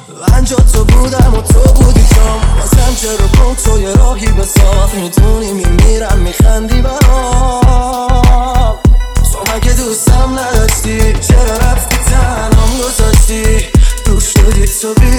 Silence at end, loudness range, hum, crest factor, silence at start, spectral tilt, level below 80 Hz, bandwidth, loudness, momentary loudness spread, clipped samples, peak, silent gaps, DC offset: 0 s; 2 LU; none; 8 dB; 0.1 s; -5 dB/octave; -8 dBFS; 16.5 kHz; -10 LUFS; 4 LU; 3%; 0 dBFS; none; under 0.1%